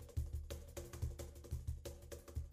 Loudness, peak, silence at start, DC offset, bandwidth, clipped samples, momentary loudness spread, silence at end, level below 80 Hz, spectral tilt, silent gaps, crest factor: -49 LUFS; -32 dBFS; 0 s; under 0.1%; 15 kHz; under 0.1%; 6 LU; 0 s; -50 dBFS; -5.5 dB/octave; none; 16 dB